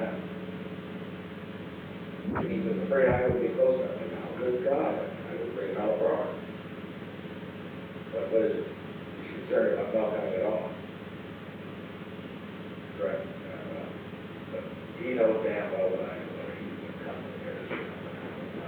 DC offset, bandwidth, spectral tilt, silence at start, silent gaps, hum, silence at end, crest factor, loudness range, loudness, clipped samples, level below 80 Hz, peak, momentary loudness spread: under 0.1%; 19 kHz; -8.5 dB/octave; 0 s; none; none; 0 s; 18 dB; 9 LU; -32 LUFS; under 0.1%; -60 dBFS; -14 dBFS; 15 LU